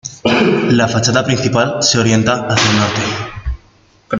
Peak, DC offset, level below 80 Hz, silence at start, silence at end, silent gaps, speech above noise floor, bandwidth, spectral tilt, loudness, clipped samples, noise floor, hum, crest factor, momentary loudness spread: 0 dBFS; under 0.1%; -34 dBFS; 0.05 s; 0 s; none; 36 dB; 9.6 kHz; -4 dB/octave; -13 LUFS; under 0.1%; -49 dBFS; none; 14 dB; 12 LU